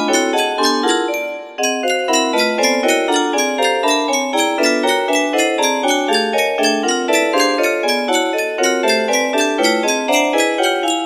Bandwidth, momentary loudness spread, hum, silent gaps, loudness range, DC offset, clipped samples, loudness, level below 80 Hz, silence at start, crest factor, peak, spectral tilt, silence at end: 15.5 kHz; 2 LU; none; none; 1 LU; under 0.1%; under 0.1%; -15 LUFS; -66 dBFS; 0 s; 16 dB; 0 dBFS; -1 dB/octave; 0 s